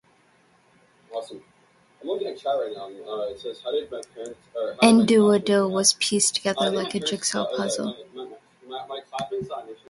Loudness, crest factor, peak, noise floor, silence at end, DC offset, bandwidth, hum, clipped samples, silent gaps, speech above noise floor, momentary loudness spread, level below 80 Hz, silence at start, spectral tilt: -23 LUFS; 22 dB; -4 dBFS; -60 dBFS; 0.15 s; under 0.1%; 11.5 kHz; none; under 0.1%; none; 37 dB; 21 LU; -66 dBFS; 1.1 s; -3.5 dB/octave